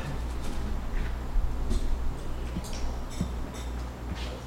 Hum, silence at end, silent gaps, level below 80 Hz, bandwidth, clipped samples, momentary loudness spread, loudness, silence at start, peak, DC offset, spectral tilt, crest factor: none; 0 s; none; -32 dBFS; 15 kHz; under 0.1%; 4 LU; -35 LUFS; 0 s; -14 dBFS; under 0.1%; -5.5 dB/octave; 16 dB